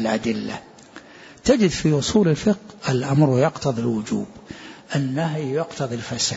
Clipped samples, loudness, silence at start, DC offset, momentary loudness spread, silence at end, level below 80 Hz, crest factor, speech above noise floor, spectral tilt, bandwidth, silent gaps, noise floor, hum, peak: under 0.1%; -22 LUFS; 0 s; under 0.1%; 16 LU; 0 s; -50 dBFS; 16 dB; 23 dB; -5.5 dB/octave; 8 kHz; none; -44 dBFS; none; -6 dBFS